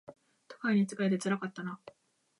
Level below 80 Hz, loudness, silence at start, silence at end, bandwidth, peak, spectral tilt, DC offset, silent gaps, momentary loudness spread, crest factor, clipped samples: -84 dBFS; -33 LUFS; 0.1 s; 0.5 s; 11.5 kHz; -18 dBFS; -6 dB/octave; under 0.1%; none; 13 LU; 16 dB; under 0.1%